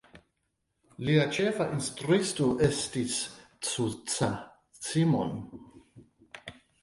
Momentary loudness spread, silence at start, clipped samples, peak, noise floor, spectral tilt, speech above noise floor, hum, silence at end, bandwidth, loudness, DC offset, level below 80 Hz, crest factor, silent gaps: 20 LU; 0.15 s; under 0.1%; -10 dBFS; -79 dBFS; -5 dB/octave; 51 dB; none; 0.3 s; 11.5 kHz; -29 LUFS; under 0.1%; -60 dBFS; 20 dB; none